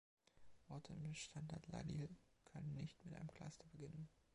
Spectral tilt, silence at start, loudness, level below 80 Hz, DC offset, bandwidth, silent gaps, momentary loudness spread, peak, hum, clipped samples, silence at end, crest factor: -5.5 dB/octave; 0.35 s; -54 LUFS; -72 dBFS; under 0.1%; 11 kHz; none; 8 LU; -38 dBFS; none; under 0.1%; 0.15 s; 16 dB